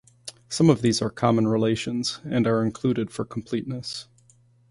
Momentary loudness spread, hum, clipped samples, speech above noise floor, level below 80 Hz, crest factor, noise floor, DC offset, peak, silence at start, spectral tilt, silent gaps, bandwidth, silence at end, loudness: 13 LU; none; under 0.1%; 35 dB; -56 dBFS; 20 dB; -58 dBFS; under 0.1%; -6 dBFS; 0.25 s; -6 dB/octave; none; 11.5 kHz; 0.7 s; -24 LUFS